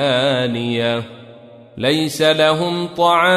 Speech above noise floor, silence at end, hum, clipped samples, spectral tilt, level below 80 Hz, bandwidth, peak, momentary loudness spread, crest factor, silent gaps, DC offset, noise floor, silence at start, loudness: 25 dB; 0 s; none; under 0.1%; -4.5 dB/octave; -58 dBFS; 15 kHz; -2 dBFS; 8 LU; 16 dB; none; under 0.1%; -41 dBFS; 0 s; -17 LUFS